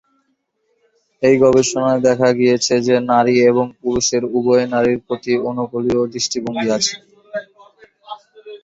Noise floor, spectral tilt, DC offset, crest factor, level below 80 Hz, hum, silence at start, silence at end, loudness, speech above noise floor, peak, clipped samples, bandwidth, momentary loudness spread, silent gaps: -67 dBFS; -4 dB/octave; under 0.1%; 16 dB; -52 dBFS; none; 1.2 s; 0.05 s; -16 LUFS; 52 dB; 0 dBFS; under 0.1%; 8 kHz; 16 LU; none